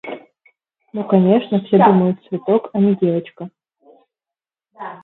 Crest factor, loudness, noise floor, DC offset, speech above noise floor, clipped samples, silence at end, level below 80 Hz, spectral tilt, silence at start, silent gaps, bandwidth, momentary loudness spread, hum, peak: 18 dB; -16 LUFS; -89 dBFS; under 0.1%; 74 dB; under 0.1%; 0.05 s; -66 dBFS; -11.5 dB/octave; 0.05 s; none; 4.1 kHz; 22 LU; none; 0 dBFS